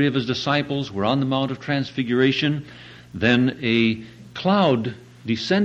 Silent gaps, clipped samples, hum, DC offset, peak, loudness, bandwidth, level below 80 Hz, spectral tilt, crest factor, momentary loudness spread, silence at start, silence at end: none; under 0.1%; none; under 0.1%; -4 dBFS; -22 LUFS; 8.2 kHz; -56 dBFS; -6.5 dB/octave; 16 dB; 13 LU; 0 s; 0 s